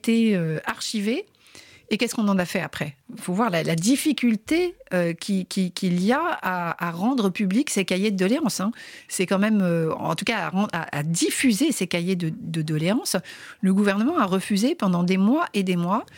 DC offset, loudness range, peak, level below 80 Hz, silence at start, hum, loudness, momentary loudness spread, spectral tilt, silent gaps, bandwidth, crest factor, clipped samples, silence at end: under 0.1%; 2 LU; -10 dBFS; -64 dBFS; 0.05 s; none; -23 LUFS; 7 LU; -5 dB/octave; none; 17 kHz; 14 dB; under 0.1%; 0 s